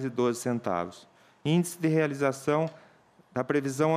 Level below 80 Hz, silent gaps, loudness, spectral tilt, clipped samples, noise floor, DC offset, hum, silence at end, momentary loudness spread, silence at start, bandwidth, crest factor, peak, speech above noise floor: -72 dBFS; none; -29 LUFS; -6 dB/octave; under 0.1%; -59 dBFS; under 0.1%; none; 0 s; 9 LU; 0 s; 15.5 kHz; 16 dB; -12 dBFS; 32 dB